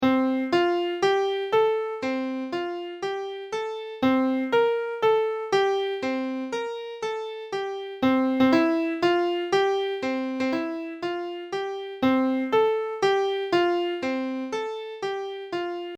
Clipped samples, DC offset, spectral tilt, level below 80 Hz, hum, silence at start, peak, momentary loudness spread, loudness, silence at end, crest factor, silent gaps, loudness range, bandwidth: under 0.1%; under 0.1%; -5 dB/octave; -66 dBFS; none; 0 s; -8 dBFS; 9 LU; -25 LUFS; 0 s; 18 dB; none; 3 LU; 9.2 kHz